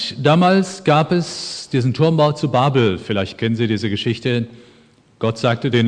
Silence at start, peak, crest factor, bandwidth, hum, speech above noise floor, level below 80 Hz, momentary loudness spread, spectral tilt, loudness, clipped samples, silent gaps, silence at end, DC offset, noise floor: 0 s; -2 dBFS; 16 dB; 10 kHz; none; 34 dB; -56 dBFS; 8 LU; -6.5 dB/octave; -18 LUFS; under 0.1%; none; 0 s; under 0.1%; -51 dBFS